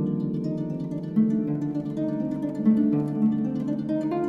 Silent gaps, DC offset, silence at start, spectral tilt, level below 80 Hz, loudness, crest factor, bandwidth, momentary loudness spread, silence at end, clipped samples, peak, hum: none; under 0.1%; 0 s; -10.5 dB/octave; -60 dBFS; -26 LUFS; 14 dB; 5.4 kHz; 7 LU; 0 s; under 0.1%; -10 dBFS; none